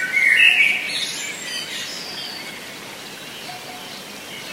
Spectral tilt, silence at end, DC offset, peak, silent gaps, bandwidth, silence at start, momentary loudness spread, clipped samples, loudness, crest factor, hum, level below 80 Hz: 0 dB/octave; 0 s; under 0.1%; -2 dBFS; none; 16 kHz; 0 s; 21 LU; under 0.1%; -17 LUFS; 20 dB; none; -66 dBFS